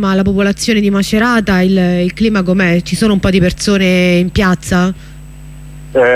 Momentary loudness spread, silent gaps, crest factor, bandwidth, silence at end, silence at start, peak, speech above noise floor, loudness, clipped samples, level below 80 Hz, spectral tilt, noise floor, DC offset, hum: 3 LU; none; 10 dB; 14.5 kHz; 0 s; 0 s; -2 dBFS; 20 dB; -12 LUFS; under 0.1%; -30 dBFS; -6 dB/octave; -31 dBFS; under 0.1%; none